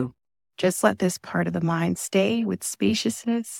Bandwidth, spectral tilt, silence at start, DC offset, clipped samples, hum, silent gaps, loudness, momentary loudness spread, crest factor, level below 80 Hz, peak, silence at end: 17.5 kHz; -5 dB/octave; 0 s; under 0.1%; under 0.1%; none; none; -24 LUFS; 5 LU; 20 dB; -62 dBFS; -6 dBFS; 0 s